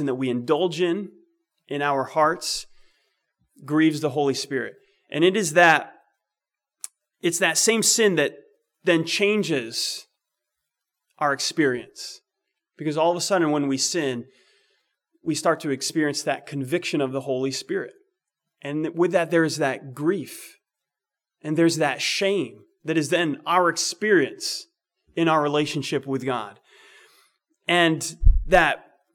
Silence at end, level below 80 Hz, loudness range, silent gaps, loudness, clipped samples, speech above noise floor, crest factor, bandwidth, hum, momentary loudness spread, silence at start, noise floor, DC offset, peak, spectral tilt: 0.35 s; -36 dBFS; 5 LU; none; -23 LUFS; under 0.1%; 66 dB; 20 dB; 19 kHz; none; 15 LU; 0 s; -88 dBFS; under 0.1%; -4 dBFS; -3.5 dB/octave